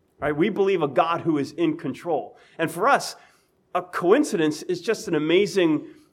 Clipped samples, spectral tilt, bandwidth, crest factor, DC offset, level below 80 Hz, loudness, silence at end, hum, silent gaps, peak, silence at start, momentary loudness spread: under 0.1%; -5 dB/octave; 16 kHz; 18 dB; under 0.1%; -64 dBFS; -23 LUFS; 0.2 s; none; none; -4 dBFS; 0.2 s; 9 LU